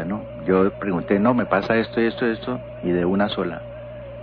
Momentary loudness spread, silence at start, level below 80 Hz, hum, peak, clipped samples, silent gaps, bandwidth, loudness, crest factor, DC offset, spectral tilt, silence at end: 12 LU; 0 s; -48 dBFS; none; -4 dBFS; under 0.1%; none; 5.4 kHz; -22 LUFS; 18 dB; under 0.1%; -9 dB/octave; 0 s